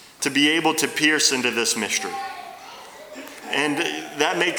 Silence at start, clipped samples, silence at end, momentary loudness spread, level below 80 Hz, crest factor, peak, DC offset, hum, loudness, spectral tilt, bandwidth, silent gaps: 0 s; under 0.1%; 0 s; 21 LU; -70 dBFS; 20 dB; -4 dBFS; under 0.1%; none; -21 LUFS; -1.5 dB/octave; over 20 kHz; none